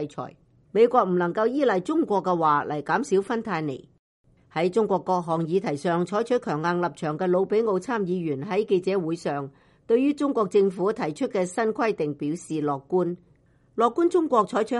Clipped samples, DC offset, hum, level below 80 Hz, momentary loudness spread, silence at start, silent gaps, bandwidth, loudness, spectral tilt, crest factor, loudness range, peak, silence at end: under 0.1%; under 0.1%; none; -68 dBFS; 8 LU; 0 s; 3.99-4.24 s; 11.5 kHz; -25 LUFS; -6.5 dB/octave; 18 dB; 3 LU; -6 dBFS; 0 s